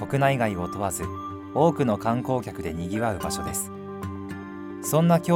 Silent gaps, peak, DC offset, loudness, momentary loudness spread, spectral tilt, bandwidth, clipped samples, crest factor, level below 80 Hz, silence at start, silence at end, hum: none; -8 dBFS; under 0.1%; -26 LUFS; 14 LU; -6 dB/octave; 17 kHz; under 0.1%; 18 dB; -50 dBFS; 0 s; 0 s; none